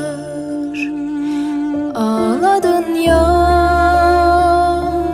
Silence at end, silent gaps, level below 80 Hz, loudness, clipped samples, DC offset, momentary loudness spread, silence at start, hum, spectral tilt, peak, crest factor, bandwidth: 0 s; none; -28 dBFS; -14 LUFS; under 0.1%; under 0.1%; 10 LU; 0 s; none; -6.5 dB/octave; 0 dBFS; 14 dB; 15.5 kHz